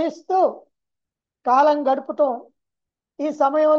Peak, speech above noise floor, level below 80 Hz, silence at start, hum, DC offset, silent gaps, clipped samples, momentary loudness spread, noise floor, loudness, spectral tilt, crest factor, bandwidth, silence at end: -6 dBFS; 66 dB; -78 dBFS; 0 s; none; under 0.1%; none; under 0.1%; 12 LU; -85 dBFS; -20 LUFS; -4.5 dB/octave; 16 dB; 7.2 kHz; 0 s